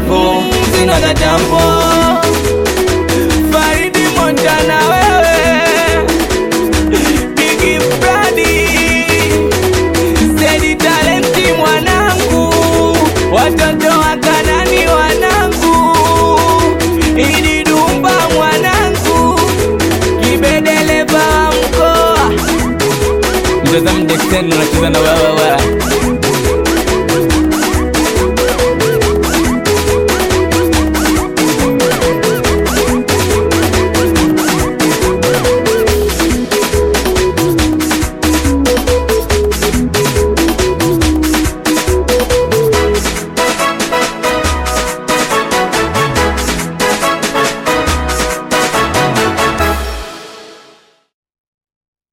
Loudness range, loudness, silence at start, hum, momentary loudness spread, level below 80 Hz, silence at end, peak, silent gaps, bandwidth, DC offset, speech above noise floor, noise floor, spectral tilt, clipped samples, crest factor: 3 LU; -11 LUFS; 0 s; none; 4 LU; -22 dBFS; 1.6 s; 0 dBFS; none; 17 kHz; under 0.1%; 36 dB; -45 dBFS; -4 dB/octave; under 0.1%; 10 dB